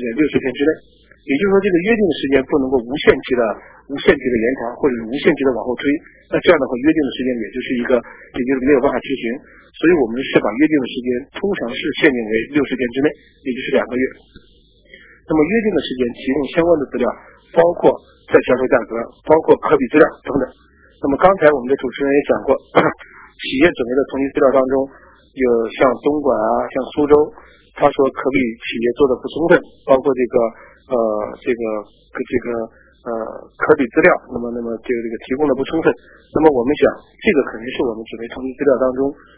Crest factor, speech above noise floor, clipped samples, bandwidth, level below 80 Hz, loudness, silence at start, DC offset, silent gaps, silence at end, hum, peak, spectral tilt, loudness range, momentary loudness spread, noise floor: 16 dB; 30 dB; under 0.1%; 4 kHz; -46 dBFS; -17 LUFS; 0 s; under 0.1%; none; 0.25 s; none; 0 dBFS; -10 dB/octave; 3 LU; 10 LU; -47 dBFS